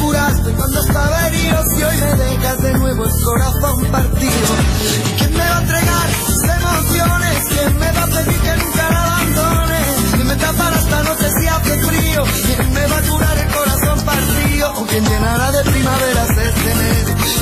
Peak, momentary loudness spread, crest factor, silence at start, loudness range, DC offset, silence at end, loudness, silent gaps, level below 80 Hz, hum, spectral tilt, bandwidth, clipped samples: -2 dBFS; 1 LU; 12 dB; 0 s; 1 LU; under 0.1%; 0 s; -14 LUFS; none; -20 dBFS; none; -4.5 dB/octave; 15 kHz; under 0.1%